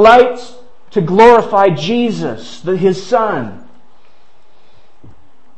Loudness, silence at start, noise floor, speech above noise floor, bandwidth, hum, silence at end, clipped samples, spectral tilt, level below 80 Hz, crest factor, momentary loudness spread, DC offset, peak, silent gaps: -12 LUFS; 0 s; -53 dBFS; 42 dB; 8.6 kHz; none; 2 s; 0.5%; -6 dB/octave; -44 dBFS; 14 dB; 16 LU; 3%; 0 dBFS; none